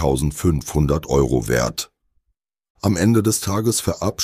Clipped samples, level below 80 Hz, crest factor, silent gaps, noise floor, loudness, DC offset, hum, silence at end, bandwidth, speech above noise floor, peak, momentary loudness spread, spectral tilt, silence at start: under 0.1%; -32 dBFS; 16 dB; 2.70-2.75 s; -73 dBFS; -20 LUFS; under 0.1%; none; 0 s; 15.5 kHz; 55 dB; -4 dBFS; 7 LU; -5 dB/octave; 0 s